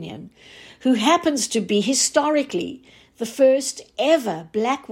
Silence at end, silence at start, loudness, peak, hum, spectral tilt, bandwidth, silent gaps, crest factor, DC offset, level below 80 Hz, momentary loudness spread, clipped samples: 0 s; 0 s; -20 LUFS; -6 dBFS; none; -3 dB/octave; 16.5 kHz; none; 16 dB; under 0.1%; -64 dBFS; 13 LU; under 0.1%